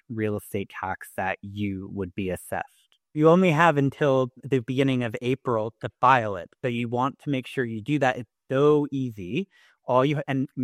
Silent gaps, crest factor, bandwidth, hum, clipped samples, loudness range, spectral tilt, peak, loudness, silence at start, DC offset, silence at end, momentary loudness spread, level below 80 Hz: none; 20 dB; 15 kHz; none; under 0.1%; 3 LU; -7 dB/octave; -6 dBFS; -25 LUFS; 0.1 s; under 0.1%; 0 s; 13 LU; -62 dBFS